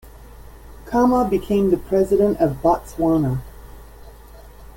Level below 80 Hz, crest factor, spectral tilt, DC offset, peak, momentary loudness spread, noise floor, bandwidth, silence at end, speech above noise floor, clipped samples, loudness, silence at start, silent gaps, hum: -40 dBFS; 16 dB; -8 dB/octave; under 0.1%; -4 dBFS; 5 LU; -42 dBFS; 17 kHz; 0.1 s; 24 dB; under 0.1%; -19 LUFS; 0.05 s; none; none